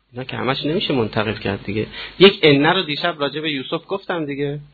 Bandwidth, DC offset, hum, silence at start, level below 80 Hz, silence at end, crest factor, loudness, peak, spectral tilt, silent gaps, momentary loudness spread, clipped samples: 4.8 kHz; under 0.1%; none; 0.15 s; -50 dBFS; 0.1 s; 20 dB; -19 LUFS; 0 dBFS; -8 dB/octave; none; 12 LU; under 0.1%